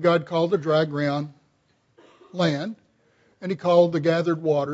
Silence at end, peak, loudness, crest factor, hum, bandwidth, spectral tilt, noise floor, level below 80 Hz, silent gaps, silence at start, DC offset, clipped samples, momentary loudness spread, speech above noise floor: 0 s; -6 dBFS; -23 LUFS; 18 dB; none; 8 kHz; -7 dB/octave; -66 dBFS; -70 dBFS; none; 0 s; under 0.1%; under 0.1%; 15 LU; 44 dB